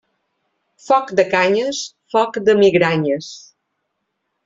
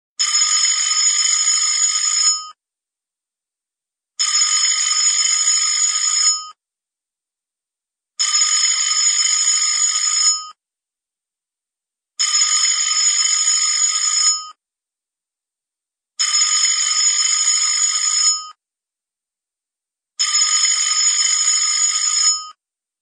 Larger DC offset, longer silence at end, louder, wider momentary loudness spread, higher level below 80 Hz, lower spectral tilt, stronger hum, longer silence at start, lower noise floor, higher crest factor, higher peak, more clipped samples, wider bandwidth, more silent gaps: neither; first, 1.05 s vs 0.5 s; about the same, -16 LUFS vs -14 LUFS; first, 12 LU vs 3 LU; first, -62 dBFS vs under -90 dBFS; first, -5 dB/octave vs 8.5 dB/octave; neither; first, 0.85 s vs 0.2 s; second, -74 dBFS vs -87 dBFS; about the same, 16 dB vs 14 dB; about the same, -2 dBFS vs -4 dBFS; neither; second, 7.8 kHz vs 14.5 kHz; neither